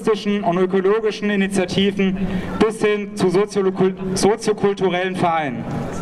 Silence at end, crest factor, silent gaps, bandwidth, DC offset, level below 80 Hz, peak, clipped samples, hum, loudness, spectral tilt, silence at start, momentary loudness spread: 0 s; 18 dB; none; 12.5 kHz; under 0.1%; -42 dBFS; 0 dBFS; under 0.1%; none; -19 LUFS; -5.5 dB/octave; 0 s; 3 LU